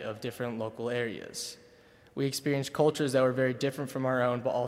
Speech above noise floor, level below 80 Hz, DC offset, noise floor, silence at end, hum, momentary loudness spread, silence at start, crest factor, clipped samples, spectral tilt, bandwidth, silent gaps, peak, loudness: 28 dB; -70 dBFS; under 0.1%; -58 dBFS; 0 s; none; 11 LU; 0 s; 18 dB; under 0.1%; -5.5 dB/octave; 16 kHz; none; -12 dBFS; -31 LUFS